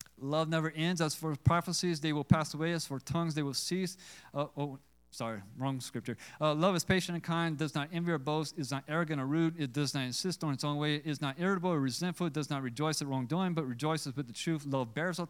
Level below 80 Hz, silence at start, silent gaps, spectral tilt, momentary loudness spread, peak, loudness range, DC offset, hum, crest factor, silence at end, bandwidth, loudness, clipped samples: -62 dBFS; 0.2 s; none; -5 dB/octave; 9 LU; -10 dBFS; 4 LU; under 0.1%; none; 24 dB; 0 s; 16.5 kHz; -34 LUFS; under 0.1%